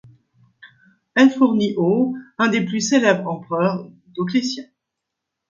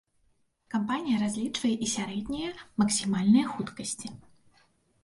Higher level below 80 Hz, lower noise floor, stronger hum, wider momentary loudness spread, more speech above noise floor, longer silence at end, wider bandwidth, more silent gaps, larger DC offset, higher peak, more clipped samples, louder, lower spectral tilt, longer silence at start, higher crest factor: second, -68 dBFS vs -60 dBFS; first, -81 dBFS vs -70 dBFS; neither; about the same, 12 LU vs 11 LU; first, 63 dB vs 41 dB; about the same, 0.85 s vs 0.85 s; second, 7.6 kHz vs 11.5 kHz; neither; neither; first, 0 dBFS vs -12 dBFS; neither; first, -19 LUFS vs -29 LUFS; about the same, -5 dB/octave vs -4 dB/octave; about the same, 0.65 s vs 0.7 s; about the same, 20 dB vs 18 dB